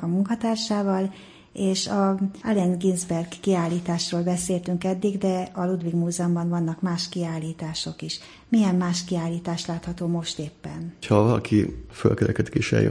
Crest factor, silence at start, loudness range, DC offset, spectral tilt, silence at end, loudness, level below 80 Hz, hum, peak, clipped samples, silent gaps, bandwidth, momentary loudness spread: 20 dB; 0 s; 2 LU; under 0.1%; -6 dB/octave; 0 s; -25 LUFS; -52 dBFS; none; -4 dBFS; under 0.1%; none; 10.5 kHz; 9 LU